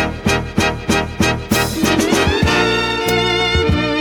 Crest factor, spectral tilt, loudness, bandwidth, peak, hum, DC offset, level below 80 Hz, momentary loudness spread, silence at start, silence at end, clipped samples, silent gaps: 14 dB; -4.5 dB/octave; -15 LUFS; 19 kHz; -2 dBFS; none; under 0.1%; -30 dBFS; 4 LU; 0 s; 0 s; under 0.1%; none